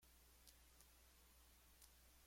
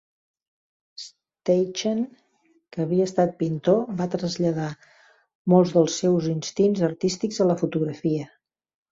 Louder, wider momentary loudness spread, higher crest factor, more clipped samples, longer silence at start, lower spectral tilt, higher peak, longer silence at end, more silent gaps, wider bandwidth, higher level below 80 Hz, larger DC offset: second, -69 LUFS vs -24 LUFS; second, 2 LU vs 13 LU; first, 26 dB vs 20 dB; neither; second, 0 s vs 1 s; second, -2 dB/octave vs -6.5 dB/octave; second, -44 dBFS vs -6 dBFS; second, 0 s vs 0.65 s; second, none vs 5.35-5.45 s; first, 16.5 kHz vs 7.8 kHz; second, -74 dBFS vs -64 dBFS; neither